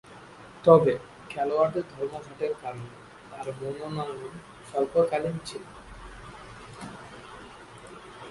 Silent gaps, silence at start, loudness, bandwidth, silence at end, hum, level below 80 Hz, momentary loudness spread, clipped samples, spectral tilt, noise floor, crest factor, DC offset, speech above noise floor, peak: none; 0.1 s; -27 LUFS; 11.5 kHz; 0 s; none; -58 dBFS; 21 LU; under 0.1%; -6.5 dB/octave; -48 dBFS; 26 dB; under 0.1%; 22 dB; -2 dBFS